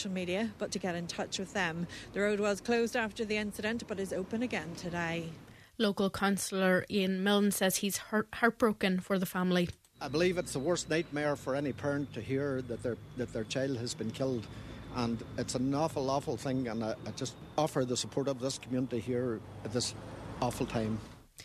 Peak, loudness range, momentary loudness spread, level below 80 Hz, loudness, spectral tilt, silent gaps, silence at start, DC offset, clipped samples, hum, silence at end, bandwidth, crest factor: -12 dBFS; 5 LU; 9 LU; -60 dBFS; -33 LUFS; -4.5 dB/octave; none; 0 s; under 0.1%; under 0.1%; none; 0 s; 14 kHz; 22 dB